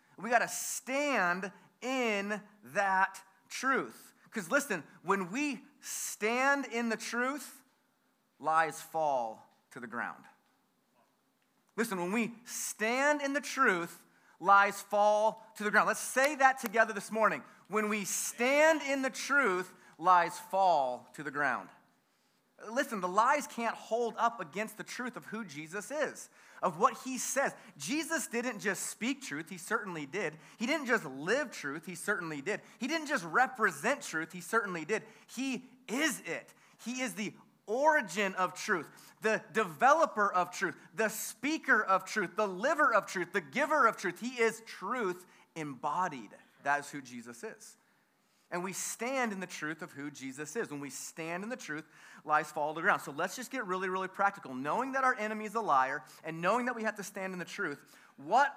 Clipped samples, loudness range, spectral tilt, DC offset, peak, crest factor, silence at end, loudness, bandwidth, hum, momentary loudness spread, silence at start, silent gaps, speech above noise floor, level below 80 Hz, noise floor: under 0.1%; 8 LU; -3 dB/octave; under 0.1%; -12 dBFS; 22 dB; 0 s; -32 LUFS; 16 kHz; none; 14 LU; 0.2 s; none; 41 dB; under -90 dBFS; -74 dBFS